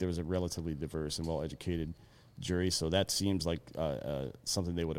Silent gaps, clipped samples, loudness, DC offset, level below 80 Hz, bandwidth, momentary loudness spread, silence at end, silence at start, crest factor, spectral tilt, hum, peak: none; under 0.1%; -35 LUFS; under 0.1%; -50 dBFS; 16.5 kHz; 8 LU; 0 s; 0 s; 18 dB; -4.5 dB/octave; none; -16 dBFS